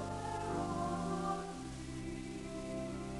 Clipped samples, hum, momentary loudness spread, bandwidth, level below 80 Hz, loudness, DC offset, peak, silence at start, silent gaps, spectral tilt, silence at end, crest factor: under 0.1%; none; 7 LU; 11.5 kHz; -54 dBFS; -41 LUFS; under 0.1%; -26 dBFS; 0 s; none; -6 dB/octave; 0 s; 14 dB